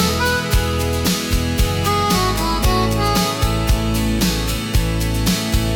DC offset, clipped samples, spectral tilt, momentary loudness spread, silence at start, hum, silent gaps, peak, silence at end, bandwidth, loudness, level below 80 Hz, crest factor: under 0.1%; under 0.1%; -4.5 dB/octave; 3 LU; 0 s; none; none; -6 dBFS; 0 s; 18 kHz; -18 LUFS; -24 dBFS; 12 dB